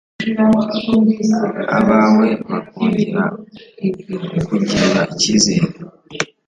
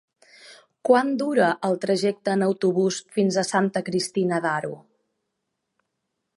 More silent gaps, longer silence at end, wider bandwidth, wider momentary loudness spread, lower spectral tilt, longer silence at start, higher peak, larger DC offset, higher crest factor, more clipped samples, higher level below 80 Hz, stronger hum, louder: neither; second, 0.2 s vs 1.6 s; second, 9.2 kHz vs 11.5 kHz; first, 12 LU vs 6 LU; about the same, -5 dB/octave vs -5 dB/octave; second, 0.2 s vs 0.45 s; first, 0 dBFS vs -4 dBFS; neither; about the same, 16 dB vs 20 dB; neither; first, -48 dBFS vs -74 dBFS; neither; first, -16 LUFS vs -23 LUFS